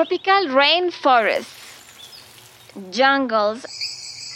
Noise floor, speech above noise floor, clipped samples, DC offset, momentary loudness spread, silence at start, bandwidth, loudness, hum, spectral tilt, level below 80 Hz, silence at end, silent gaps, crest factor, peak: -46 dBFS; 27 dB; under 0.1%; under 0.1%; 24 LU; 0 s; 16.5 kHz; -18 LUFS; none; -2.5 dB/octave; -70 dBFS; 0 s; none; 18 dB; -2 dBFS